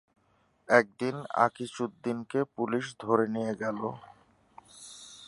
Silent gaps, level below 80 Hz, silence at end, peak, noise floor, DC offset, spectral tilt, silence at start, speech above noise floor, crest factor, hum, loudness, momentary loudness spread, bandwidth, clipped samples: none; -74 dBFS; 0 s; -6 dBFS; -69 dBFS; under 0.1%; -5.5 dB/octave; 0.7 s; 40 dB; 26 dB; none; -30 LUFS; 21 LU; 11.5 kHz; under 0.1%